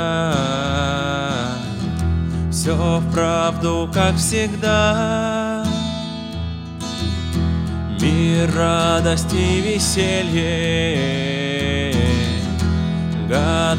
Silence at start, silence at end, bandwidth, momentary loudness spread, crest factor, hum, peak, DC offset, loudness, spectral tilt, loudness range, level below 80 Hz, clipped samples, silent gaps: 0 s; 0 s; 16 kHz; 7 LU; 16 dB; none; -4 dBFS; under 0.1%; -19 LUFS; -5 dB/octave; 3 LU; -32 dBFS; under 0.1%; none